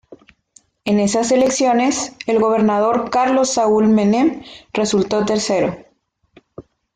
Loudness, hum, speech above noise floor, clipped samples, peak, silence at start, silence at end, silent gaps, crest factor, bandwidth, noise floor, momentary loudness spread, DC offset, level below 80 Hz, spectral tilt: -16 LUFS; none; 45 dB; under 0.1%; -4 dBFS; 0.1 s; 0.35 s; none; 12 dB; 9.6 kHz; -60 dBFS; 8 LU; under 0.1%; -54 dBFS; -4.5 dB/octave